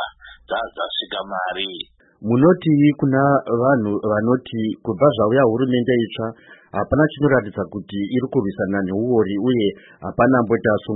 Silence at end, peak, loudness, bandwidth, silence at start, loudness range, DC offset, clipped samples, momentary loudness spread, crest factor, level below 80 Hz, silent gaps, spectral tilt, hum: 0 s; -4 dBFS; -19 LUFS; 4.1 kHz; 0 s; 3 LU; under 0.1%; under 0.1%; 12 LU; 16 dB; -50 dBFS; none; -12 dB/octave; none